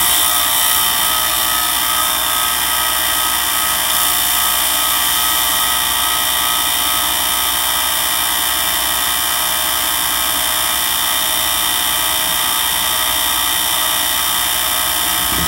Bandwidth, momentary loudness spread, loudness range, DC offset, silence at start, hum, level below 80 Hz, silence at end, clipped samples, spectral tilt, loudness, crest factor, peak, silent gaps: 16.5 kHz; 2 LU; 1 LU; under 0.1%; 0 s; 60 Hz at -40 dBFS; -40 dBFS; 0 s; under 0.1%; 0.5 dB/octave; -13 LUFS; 16 dB; 0 dBFS; none